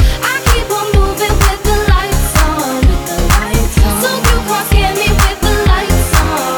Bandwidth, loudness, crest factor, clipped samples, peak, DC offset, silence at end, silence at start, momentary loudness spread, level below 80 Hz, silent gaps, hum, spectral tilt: over 20 kHz; -12 LUFS; 10 dB; under 0.1%; 0 dBFS; under 0.1%; 0 s; 0 s; 2 LU; -14 dBFS; none; none; -4.5 dB/octave